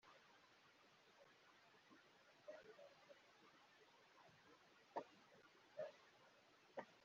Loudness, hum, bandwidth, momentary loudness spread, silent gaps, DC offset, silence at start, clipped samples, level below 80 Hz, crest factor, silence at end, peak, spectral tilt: -61 LUFS; none; 7.2 kHz; 13 LU; none; under 0.1%; 0.05 s; under 0.1%; under -90 dBFS; 28 dB; 0 s; -36 dBFS; -2 dB/octave